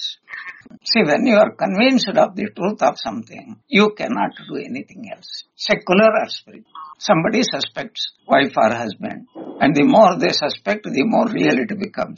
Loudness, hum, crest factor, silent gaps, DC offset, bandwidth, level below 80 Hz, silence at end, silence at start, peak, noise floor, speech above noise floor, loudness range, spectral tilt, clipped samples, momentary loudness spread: -17 LUFS; none; 18 dB; none; under 0.1%; 7.2 kHz; -60 dBFS; 0 s; 0 s; -2 dBFS; -36 dBFS; 18 dB; 4 LU; -3 dB/octave; under 0.1%; 18 LU